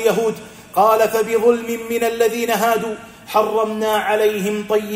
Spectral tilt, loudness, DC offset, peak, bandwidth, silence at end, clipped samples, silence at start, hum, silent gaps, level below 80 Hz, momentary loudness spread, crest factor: -4 dB/octave; -18 LUFS; under 0.1%; -2 dBFS; 16 kHz; 0 s; under 0.1%; 0 s; none; none; -58 dBFS; 8 LU; 16 dB